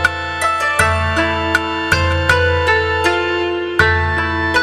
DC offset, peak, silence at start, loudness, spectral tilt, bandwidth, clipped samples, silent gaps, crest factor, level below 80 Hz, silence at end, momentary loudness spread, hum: under 0.1%; -2 dBFS; 0 s; -15 LUFS; -4.5 dB/octave; 15 kHz; under 0.1%; none; 14 dB; -30 dBFS; 0 s; 4 LU; none